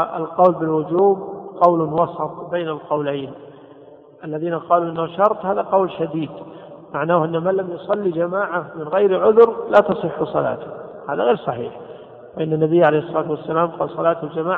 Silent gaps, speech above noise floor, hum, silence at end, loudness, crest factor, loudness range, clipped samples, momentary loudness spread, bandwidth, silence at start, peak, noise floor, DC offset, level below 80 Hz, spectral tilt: none; 25 dB; none; 0 s; -19 LUFS; 18 dB; 5 LU; under 0.1%; 15 LU; 4.4 kHz; 0 s; 0 dBFS; -44 dBFS; under 0.1%; -62 dBFS; -9.5 dB/octave